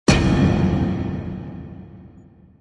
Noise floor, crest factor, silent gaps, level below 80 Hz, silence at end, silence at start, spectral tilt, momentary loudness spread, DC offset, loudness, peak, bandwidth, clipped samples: -47 dBFS; 20 dB; none; -32 dBFS; 0.55 s; 0.1 s; -6 dB/octave; 21 LU; under 0.1%; -20 LUFS; -2 dBFS; 11 kHz; under 0.1%